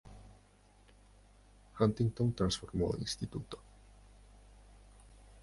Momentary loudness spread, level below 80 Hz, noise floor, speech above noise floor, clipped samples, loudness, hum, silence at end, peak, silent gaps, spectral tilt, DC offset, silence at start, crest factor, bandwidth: 23 LU; -54 dBFS; -64 dBFS; 30 dB; under 0.1%; -35 LUFS; 50 Hz at -55 dBFS; 0.05 s; -14 dBFS; none; -6 dB/octave; under 0.1%; 0.05 s; 24 dB; 11.5 kHz